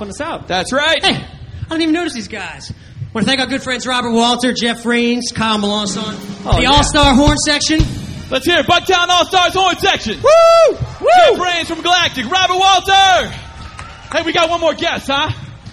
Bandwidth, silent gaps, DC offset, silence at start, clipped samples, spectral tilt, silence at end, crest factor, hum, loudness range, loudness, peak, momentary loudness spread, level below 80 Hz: 14.5 kHz; none; under 0.1%; 0 s; under 0.1%; -3.5 dB/octave; 0 s; 14 dB; none; 6 LU; -13 LUFS; 0 dBFS; 16 LU; -30 dBFS